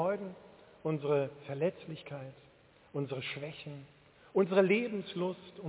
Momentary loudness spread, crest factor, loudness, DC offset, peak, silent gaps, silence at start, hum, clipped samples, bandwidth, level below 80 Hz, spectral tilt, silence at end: 18 LU; 20 dB; -34 LUFS; under 0.1%; -14 dBFS; none; 0 s; none; under 0.1%; 4 kHz; -74 dBFS; -5.5 dB/octave; 0 s